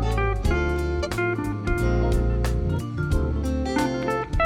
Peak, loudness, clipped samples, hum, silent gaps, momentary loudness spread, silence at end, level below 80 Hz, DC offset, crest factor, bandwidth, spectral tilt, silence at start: -10 dBFS; -25 LUFS; under 0.1%; none; none; 3 LU; 0 s; -26 dBFS; under 0.1%; 14 dB; 15.5 kHz; -7 dB/octave; 0 s